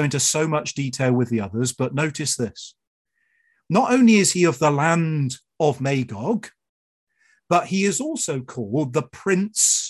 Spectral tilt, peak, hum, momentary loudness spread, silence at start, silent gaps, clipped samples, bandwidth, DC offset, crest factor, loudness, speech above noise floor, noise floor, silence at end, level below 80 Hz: -4.5 dB/octave; -4 dBFS; none; 10 LU; 0 s; 2.87-3.05 s, 6.69-7.07 s; under 0.1%; 13 kHz; under 0.1%; 18 dB; -21 LUFS; 46 dB; -66 dBFS; 0 s; -60 dBFS